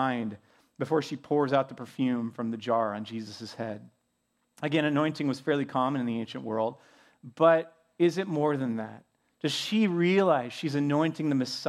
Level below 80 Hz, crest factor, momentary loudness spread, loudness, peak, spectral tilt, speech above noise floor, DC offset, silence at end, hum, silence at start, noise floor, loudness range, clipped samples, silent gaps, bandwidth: -78 dBFS; 20 dB; 13 LU; -28 LUFS; -8 dBFS; -6 dB/octave; 48 dB; under 0.1%; 0 s; none; 0 s; -76 dBFS; 4 LU; under 0.1%; none; 13.5 kHz